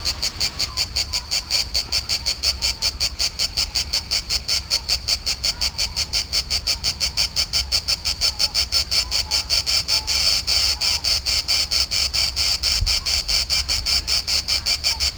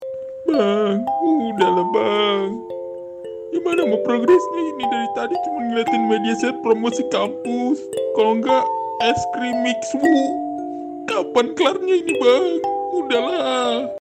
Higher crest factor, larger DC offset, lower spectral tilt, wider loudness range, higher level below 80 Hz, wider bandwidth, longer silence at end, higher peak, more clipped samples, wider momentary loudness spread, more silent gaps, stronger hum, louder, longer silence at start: about the same, 18 dB vs 14 dB; neither; second, 0 dB/octave vs -4.5 dB/octave; about the same, 3 LU vs 2 LU; first, -34 dBFS vs -62 dBFS; first, over 20 kHz vs 10.5 kHz; about the same, 0 s vs 0 s; about the same, -4 dBFS vs -4 dBFS; neither; second, 4 LU vs 9 LU; neither; neither; about the same, -19 LUFS vs -19 LUFS; about the same, 0 s vs 0 s